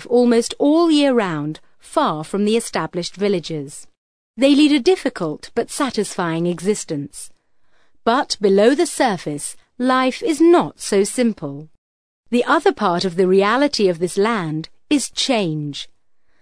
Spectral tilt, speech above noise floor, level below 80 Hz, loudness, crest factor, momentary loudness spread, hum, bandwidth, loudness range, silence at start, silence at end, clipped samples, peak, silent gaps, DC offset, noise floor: -4.5 dB/octave; 45 dB; -56 dBFS; -18 LUFS; 16 dB; 14 LU; none; 11 kHz; 4 LU; 0 s; 0.55 s; under 0.1%; -2 dBFS; 3.98-4.34 s, 11.78-12.23 s; 0.3%; -62 dBFS